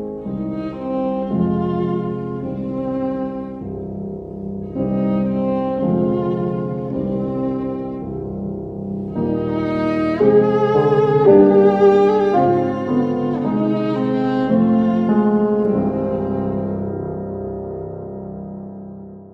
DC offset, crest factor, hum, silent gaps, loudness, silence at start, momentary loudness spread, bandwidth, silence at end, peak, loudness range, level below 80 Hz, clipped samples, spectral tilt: under 0.1%; 18 dB; none; none; -19 LUFS; 0 s; 15 LU; 6 kHz; 0 s; 0 dBFS; 10 LU; -46 dBFS; under 0.1%; -10 dB/octave